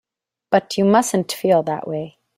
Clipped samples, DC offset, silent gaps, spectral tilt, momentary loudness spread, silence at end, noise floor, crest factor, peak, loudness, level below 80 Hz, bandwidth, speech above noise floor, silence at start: under 0.1%; under 0.1%; none; -5 dB/octave; 10 LU; 0.3 s; -44 dBFS; 18 dB; -2 dBFS; -19 LUFS; -62 dBFS; 16 kHz; 26 dB; 0.5 s